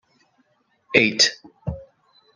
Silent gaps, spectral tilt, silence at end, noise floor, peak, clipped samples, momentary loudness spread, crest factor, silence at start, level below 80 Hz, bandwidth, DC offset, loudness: none; -2.5 dB/octave; 0.55 s; -65 dBFS; -2 dBFS; under 0.1%; 18 LU; 24 dB; 0.9 s; -50 dBFS; 12 kHz; under 0.1%; -18 LUFS